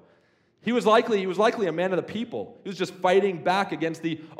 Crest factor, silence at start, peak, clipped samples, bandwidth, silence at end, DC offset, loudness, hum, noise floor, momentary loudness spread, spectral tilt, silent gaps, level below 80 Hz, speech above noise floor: 18 dB; 0.65 s; -6 dBFS; under 0.1%; 14 kHz; 0.05 s; under 0.1%; -25 LUFS; none; -63 dBFS; 12 LU; -5.5 dB/octave; none; -78 dBFS; 39 dB